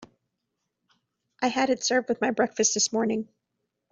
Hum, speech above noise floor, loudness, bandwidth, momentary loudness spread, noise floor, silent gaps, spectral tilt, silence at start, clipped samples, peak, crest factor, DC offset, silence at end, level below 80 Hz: none; 56 dB; -25 LUFS; 8.2 kHz; 7 LU; -81 dBFS; none; -2 dB/octave; 0 s; under 0.1%; -10 dBFS; 18 dB; under 0.1%; 0.65 s; -70 dBFS